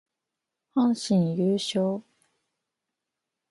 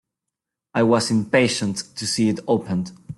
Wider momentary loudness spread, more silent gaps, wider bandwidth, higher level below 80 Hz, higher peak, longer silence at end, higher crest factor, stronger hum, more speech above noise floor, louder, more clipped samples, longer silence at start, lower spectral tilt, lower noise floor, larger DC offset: about the same, 7 LU vs 9 LU; neither; about the same, 11.5 kHz vs 12.5 kHz; second, -72 dBFS vs -58 dBFS; second, -12 dBFS vs -4 dBFS; first, 1.5 s vs 0.05 s; about the same, 16 dB vs 18 dB; neither; about the same, 62 dB vs 64 dB; second, -26 LUFS vs -21 LUFS; neither; about the same, 0.75 s vs 0.75 s; first, -6.5 dB/octave vs -4.5 dB/octave; about the same, -86 dBFS vs -84 dBFS; neither